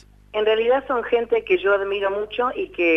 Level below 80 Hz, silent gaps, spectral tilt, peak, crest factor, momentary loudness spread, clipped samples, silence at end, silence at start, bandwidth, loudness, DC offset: -52 dBFS; none; -6 dB/octave; -6 dBFS; 14 dB; 5 LU; under 0.1%; 0 s; 0.35 s; 6 kHz; -21 LUFS; under 0.1%